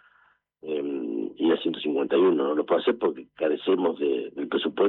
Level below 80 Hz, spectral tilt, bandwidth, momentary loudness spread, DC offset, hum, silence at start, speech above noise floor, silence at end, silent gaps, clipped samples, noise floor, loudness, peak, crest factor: -74 dBFS; -9 dB/octave; 4.2 kHz; 9 LU; under 0.1%; none; 0.65 s; 39 dB; 0 s; none; under 0.1%; -63 dBFS; -26 LUFS; -10 dBFS; 14 dB